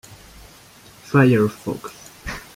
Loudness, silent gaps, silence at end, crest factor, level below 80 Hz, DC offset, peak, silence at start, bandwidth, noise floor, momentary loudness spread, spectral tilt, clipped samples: -19 LUFS; none; 0.15 s; 18 dB; -46 dBFS; under 0.1%; -4 dBFS; 0.1 s; 16 kHz; -47 dBFS; 19 LU; -7 dB/octave; under 0.1%